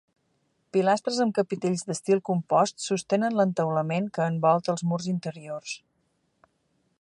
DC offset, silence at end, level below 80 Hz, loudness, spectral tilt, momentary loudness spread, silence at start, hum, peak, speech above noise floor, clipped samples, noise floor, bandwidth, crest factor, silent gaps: under 0.1%; 1.25 s; -74 dBFS; -26 LUFS; -5.5 dB/octave; 11 LU; 0.75 s; none; -8 dBFS; 47 dB; under 0.1%; -72 dBFS; 11.5 kHz; 18 dB; none